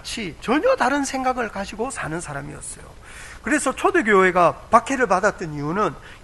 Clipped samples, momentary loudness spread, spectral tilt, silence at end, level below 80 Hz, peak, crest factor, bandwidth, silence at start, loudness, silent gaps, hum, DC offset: under 0.1%; 17 LU; -4.5 dB/octave; 0.05 s; -46 dBFS; 0 dBFS; 22 dB; 12 kHz; 0.05 s; -20 LUFS; none; none; under 0.1%